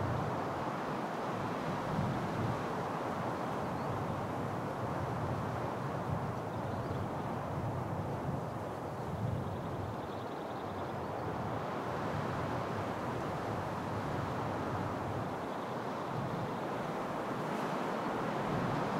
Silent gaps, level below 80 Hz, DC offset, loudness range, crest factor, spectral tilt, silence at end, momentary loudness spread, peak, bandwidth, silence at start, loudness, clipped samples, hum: none; -60 dBFS; under 0.1%; 2 LU; 14 dB; -7 dB/octave; 0 s; 4 LU; -22 dBFS; 16 kHz; 0 s; -38 LUFS; under 0.1%; none